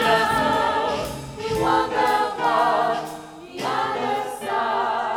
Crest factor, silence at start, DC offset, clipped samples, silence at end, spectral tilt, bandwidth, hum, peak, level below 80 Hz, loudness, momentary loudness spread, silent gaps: 16 dB; 0 s; under 0.1%; under 0.1%; 0 s; -4 dB/octave; 18.5 kHz; none; -6 dBFS; -48 dBFS; -22 LUFS; 11 LU; none